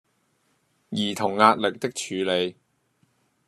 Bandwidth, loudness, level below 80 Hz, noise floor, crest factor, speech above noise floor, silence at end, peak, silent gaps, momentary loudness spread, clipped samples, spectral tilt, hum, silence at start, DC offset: 13.5 kHz; -24 LUFS; -74 dBFS; -69 dBFS; 26 dB; 46 dB; 0.95 s; -2 dBFS; none; 12 LU; under 0.1%; -4 dB/octave; none; 0.9 s; under 0.1%